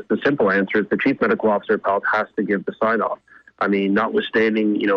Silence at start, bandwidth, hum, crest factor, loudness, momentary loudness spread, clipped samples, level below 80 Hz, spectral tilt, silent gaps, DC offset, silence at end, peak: 0 s; 6.4 kHz; none; 12 dB; -20 LUFS; 4 LU; under 0.1%; -60 dBFS; -8 dB/octave; none; under 0.1%; 0 s; -8 dBFS